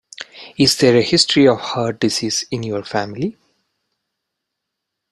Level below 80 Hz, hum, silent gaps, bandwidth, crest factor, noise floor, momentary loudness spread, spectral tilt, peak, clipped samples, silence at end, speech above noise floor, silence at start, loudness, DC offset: -54 dBFS; none; none; 14 kHz; 18 dB; -79 dBFS; 14 LU; -4 dB/octave; 0 dBFS; under 0.1%; 1.8 s; 63 dB; 0.2 s; -16 LUFS; under 0.1%